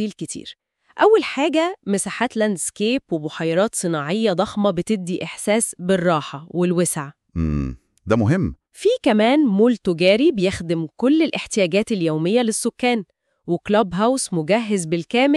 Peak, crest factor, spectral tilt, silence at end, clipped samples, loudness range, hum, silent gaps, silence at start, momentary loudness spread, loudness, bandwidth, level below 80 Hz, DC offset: -4 dBFS; 16 dB; -5 dB/octave; 0 s; under 0.1%; 3 LU; none; none; 0 s; 11 LU; -20 LUFS; 13.5 kHz; -44 dBFS; under 0.1%